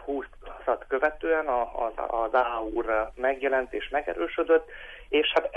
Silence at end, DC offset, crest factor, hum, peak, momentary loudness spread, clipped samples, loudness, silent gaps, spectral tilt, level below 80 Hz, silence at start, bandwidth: 0 s; under 0.1%; 16 dB; none; -10 dBFS; 10 LU; under 0.1%; -27 LUFS; none; -5 dB/octave; -48 dBFS; 0 s; 6 kHz